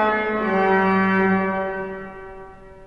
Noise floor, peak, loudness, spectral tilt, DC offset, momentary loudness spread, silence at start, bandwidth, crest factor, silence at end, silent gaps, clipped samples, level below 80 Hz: -40 dBFS; -8 dBFS; -20 LUFS; -8.5 dB/octave; under 0.1%; 20 LU; 0 s; 5.6 kHz; 14 dB; 0 s; none; under 0.1%; -48 dBFS